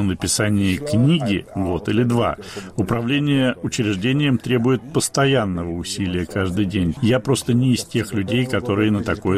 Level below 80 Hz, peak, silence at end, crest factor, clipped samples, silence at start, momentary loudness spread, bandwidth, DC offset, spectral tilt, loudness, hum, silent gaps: -44 dBFS; -6 dBFS; 0 s; 12 dB; under 0.1%; 0 s; 6 LU; 15 kHz; under 0.1%; -5.5 dB/octave; -20 LUFS; none; none